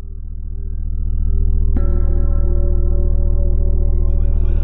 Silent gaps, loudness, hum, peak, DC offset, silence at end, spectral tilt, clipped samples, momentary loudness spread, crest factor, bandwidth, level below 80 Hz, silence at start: none; -20 LUFS; none; -4 dBFS; under 0.1%; 0 s; -13 dB/octave; under 0.1%; 9 LU; 8 dB; 1.4 kHz; -14 dBFS; 0 s